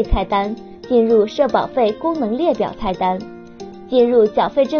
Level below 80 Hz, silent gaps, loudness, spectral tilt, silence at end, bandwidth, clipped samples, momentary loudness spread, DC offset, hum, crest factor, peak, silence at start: -32 dBFS; none; -17 LUFS; -5 dB/octave; 0 s; 6.8 kHz; under 0.1%; 16 LU; under 0.1%; none; 16 dB; -2 dBFS; 0 s